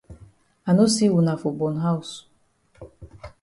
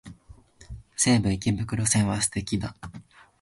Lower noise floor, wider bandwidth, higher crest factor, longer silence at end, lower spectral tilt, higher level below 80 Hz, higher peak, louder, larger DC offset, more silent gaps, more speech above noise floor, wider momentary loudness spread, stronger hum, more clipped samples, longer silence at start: first, -62 dBFS vs -51 dBFS; about the same, 11.5 kHz vs 12 kHz; about the same, 16 dB vs 18 dB; second, 0.15 s vs 0.4 s; first, -6 dB/octave vs -4 dB/octave; second, -54 dBFS vs -46 dBFS; about the same, -8 dBFS vs -8 dBFS; first, -21 LUFS vs -25 LUFS; neither; neither; first, 42 dB vs 27 dB; about the same, 23 LU vs 21 LU; neither; neither; about the same, 0.1 s vs 0.05 s